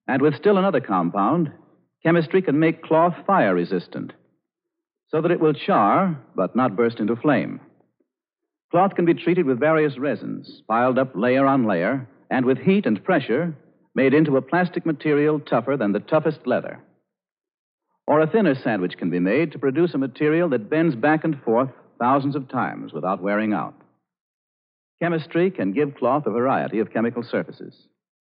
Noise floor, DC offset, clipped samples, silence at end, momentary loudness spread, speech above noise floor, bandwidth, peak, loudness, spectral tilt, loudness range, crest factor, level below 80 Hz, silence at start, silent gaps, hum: -85 dBFS; under 0.1%; under 0.1%; 0.6 s; 9 LU; 64 dB; 5.2 kHz; -6 dBFS; -21 LUFS; -6 dB/octave; 4 LU; 16 dB; -80 dBFS; 0.1 s; 8.64-8.69 s, 17.54-17.78 s, 24.21-24.98 s; none